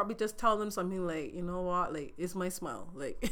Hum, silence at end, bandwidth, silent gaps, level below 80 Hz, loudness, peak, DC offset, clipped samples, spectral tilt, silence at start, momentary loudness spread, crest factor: none; 0 s; over 20 kHz; none; -50 dBFS; -35 LUFS; -14 dBFS; under 0.1%; under 0.1%; -5 dB/octave; 0 s; 10 LU; 20 dB